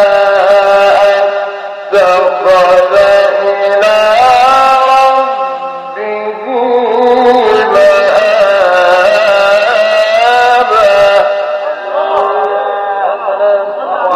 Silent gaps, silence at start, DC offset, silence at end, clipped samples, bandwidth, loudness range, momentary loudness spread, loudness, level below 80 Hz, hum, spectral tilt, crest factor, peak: none; 0 s; under 0.1%; 0 s; under 0.1%; 13 kHz; 3 LU; 9 LU; -8 LUFS; -48 dBFS; none; -3 dB/octave; 8 dB; 0 dBFS